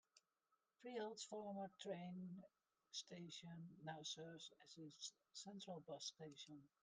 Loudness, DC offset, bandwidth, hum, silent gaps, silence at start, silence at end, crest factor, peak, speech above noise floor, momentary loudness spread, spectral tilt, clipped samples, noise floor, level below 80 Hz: -55 LUFS; under 0.1%; 10 kHz; none; none; 0.15 s; 0.15 s; 18 dB; -38 dBFS; 34 dB; 8 LU; -4 dB/octave; under 0.1%; -90 dBFS; under -90 dBFS